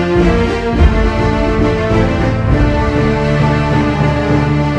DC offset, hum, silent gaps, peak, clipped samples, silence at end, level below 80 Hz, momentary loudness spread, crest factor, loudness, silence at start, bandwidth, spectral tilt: under 0.1%; none; none; 0 dBFS; under 0.1%; 0 s; -18 dBFS; 2 LU; 12 dB; -13 LUFS; 0 s; 9.6 kHz; -7.5 dB/octave